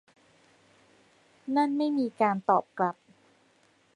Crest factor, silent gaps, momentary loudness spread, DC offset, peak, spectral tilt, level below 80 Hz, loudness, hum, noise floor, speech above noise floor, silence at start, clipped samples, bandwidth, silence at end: 22 dB; none; 8 LU; under 0.1%; -10 dBFS; -7 dB/octave; -80 dBFS; -28 LUFS; none; -65 dBFS; 38 dB; 1.45 s; under 0.1%; 10 kHz; 1.05 s